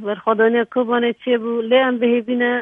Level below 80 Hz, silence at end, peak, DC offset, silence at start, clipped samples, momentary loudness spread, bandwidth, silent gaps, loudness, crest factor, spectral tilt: -72 dBFS; 0 s; -2 dBFS; under 0.1%; 0 s; under 0.1%; 4 LU; 3.8 kHz; none; -18 LUFS; 16 dB; -7.5 dB/octave